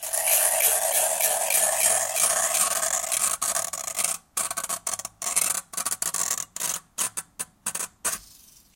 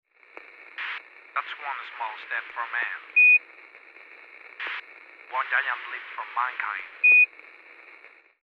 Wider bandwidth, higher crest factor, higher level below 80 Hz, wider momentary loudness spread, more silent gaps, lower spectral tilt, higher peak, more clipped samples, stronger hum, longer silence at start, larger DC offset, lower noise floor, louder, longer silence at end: first, 17.5 kHz vs 5.4 kHz; about the same, 22 dB vs 18 dB; first, -64 dBFS vs -86 dBFS; second, 10 LU vs 20 LU; neither; second, 1.5 dB/octave vs -0.5 dB/octave; first, -4 dBFS vs -10 dBFS; neither; neither; second, 0 s vs 0.6 s; neither; about the same, -53 dBFS vs -52 dBFS; about the same, -23 LUFS vs -23 LUFS; second, 0.5 s vs 1.2 s